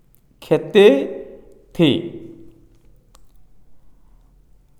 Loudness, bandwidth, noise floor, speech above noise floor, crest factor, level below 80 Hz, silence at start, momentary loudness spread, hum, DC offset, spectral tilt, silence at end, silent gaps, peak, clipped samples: -16 LUFS; 13.5 kHz; -51 dBFS; 36 dB; 20 dB; -54 dBFS; 0.5 s; 24 LU; none; under 0.1%; -6.5 dB/octave; 1.05 s; none; 0 dBFS; under 0.1%